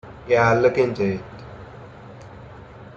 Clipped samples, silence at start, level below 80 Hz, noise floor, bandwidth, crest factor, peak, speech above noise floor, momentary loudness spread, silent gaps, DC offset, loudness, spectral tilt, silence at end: under 0.1%; 0.05 s; -50 dBFS; -41 dBFS; 7.4 kHz; 18 dB; -4 dBFS; 22 dB; 24 LU; none; under 0.1%; -20 LUFS; -7 dB/octave; 0.05 s